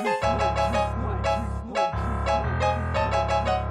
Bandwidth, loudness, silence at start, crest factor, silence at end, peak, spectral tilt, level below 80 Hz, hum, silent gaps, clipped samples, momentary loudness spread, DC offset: 10.5 kHz; -25 LUFS; 0 s; 12 dB; 0 s; -12 dBFS; -6 dB/octave; -34 dBFS; none; none; under 0.1%; 4 LU; under 0.1%